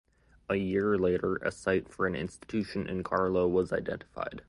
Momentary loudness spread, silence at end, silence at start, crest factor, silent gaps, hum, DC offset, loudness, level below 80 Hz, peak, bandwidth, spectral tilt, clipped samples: 10 LU; 0.05 s; 0.5 s; 18 dB; none; none; under 0.1%; -31 LUFS; -54 dBFS; -12 dBFS; 11.5 kHz; -7 dB/octave; under 0.1%